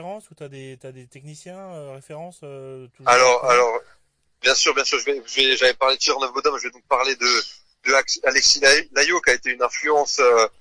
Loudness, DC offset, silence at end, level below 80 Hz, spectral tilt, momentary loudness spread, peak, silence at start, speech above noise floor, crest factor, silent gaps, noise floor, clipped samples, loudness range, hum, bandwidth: -18 LUFS; under 0.1%; 0.1 s; -56 dBFS; -0.5 dB/octave; 23 LU; -4 dBFS; 0 s; 31 dB; 16 dB; none; -51 dBFS; under 0.1%; 4 LU; none; 10.5 kHz